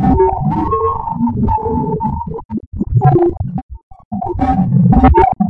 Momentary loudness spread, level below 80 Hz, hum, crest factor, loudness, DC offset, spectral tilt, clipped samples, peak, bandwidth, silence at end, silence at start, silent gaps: 14 LU; -24 dBFS; none; 12 dB; -14 LUFS; under 0.1%; -11.5 dB/octave; under 0.1%; 0 dBFS; 4.3 kHz; 0 s; 0 s; 2.45-2.49 s, 2.67-2.72 s, 3.63-3.69 s, 3.83-3.91 s, 4.05-4.11 s